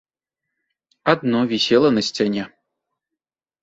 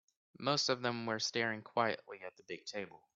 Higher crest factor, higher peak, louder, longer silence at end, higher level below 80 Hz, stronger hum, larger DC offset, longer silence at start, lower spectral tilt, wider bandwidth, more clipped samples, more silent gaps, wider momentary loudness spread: about the same, 20 dB vs 22 dB; first, -2 dBFS vs -18 dBFS; first, -19 LUFS vs -37 LUFS; first, 1.15 s vs 0.2 s; first, -62 dBFS vs -80 dBFS; neither; neither; first, 1.05 s vs 0.4 s; first, -5 dB/octave vs -3 dB/octave; about the same, 8 kHz vs 8 kHz; neither; neither; second, 10 LU vs 14 LU